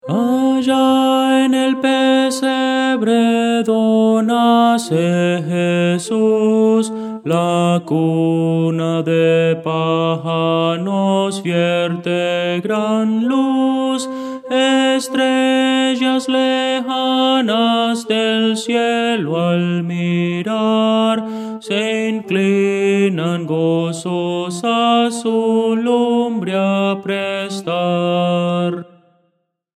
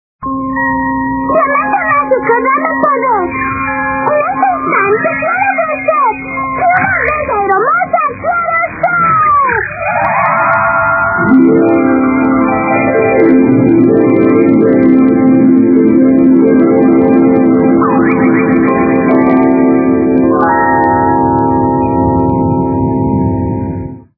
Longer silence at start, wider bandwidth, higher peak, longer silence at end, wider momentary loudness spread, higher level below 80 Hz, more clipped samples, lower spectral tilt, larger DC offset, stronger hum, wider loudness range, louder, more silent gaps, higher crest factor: second, 0.05 s vs 0.2 s; first, 13.5 kHz vs 2.6 kHz; about the same, -2 dBFS vs 0 dBFS; first, 0.95 s vs 0.15 s; about the same, 6 LU vs 6 LU; second, -68 dBFS vs -36 dBFS; second, under 0.1% vs 0.2%; second, -5.5 dB/octave vs -12.5 dB/octave; neither; neither; about the same, 3 LU vs 4 LU; second, -16 LUFS vs -10 LUFS; neither; about the same, 14 dB vs 10 dB